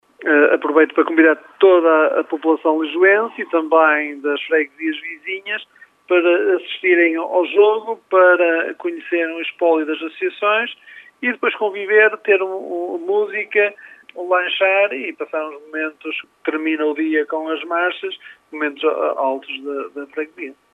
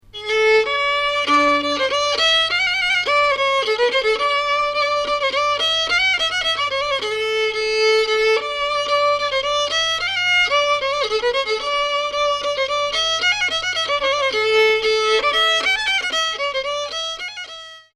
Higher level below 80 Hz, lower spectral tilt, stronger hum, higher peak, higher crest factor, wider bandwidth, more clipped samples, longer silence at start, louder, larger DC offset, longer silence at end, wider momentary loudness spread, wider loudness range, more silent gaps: second, -82 dBFS vs -50 dBFS; first, -5 dB/octave vs -0.5 dB/octave; neither; about the same, -2 dBFS vs -4 dBFS; about the same, 16 dB vs 14 dB; second, 4 kHz vs 12.5 kHz; neither; about the same, 0.2 s vs 0.15 s; about the same, -17 LUFS vs -17 LUFS; neither; about the same, 0.2 s vs 0.15 s; first, 13 LU vs 5 LU; first, 6 LU vs 2 LU; neither